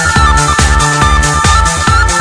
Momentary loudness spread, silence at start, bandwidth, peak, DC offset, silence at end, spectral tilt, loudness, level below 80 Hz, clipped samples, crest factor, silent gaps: 1 LU; 0 s; 11 kHz; 0 dBFS; under 0.1%; 0 s; -3.5 dB/octave; -8 LUFS; -14 dBFS; 0.3%; 8 dB; none